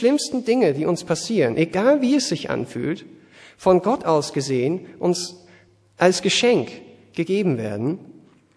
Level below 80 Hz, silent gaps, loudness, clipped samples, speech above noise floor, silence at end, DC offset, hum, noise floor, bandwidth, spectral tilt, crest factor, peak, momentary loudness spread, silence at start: -60 dBFS; none; -21 LUFS; under 0.1%; 33 dB; 0.45 s; under 0.1%; none; -53 dBFS; 11 kHz; -5 dB/octave; 18 dB; -2 dBFS; 10 LU; 0 s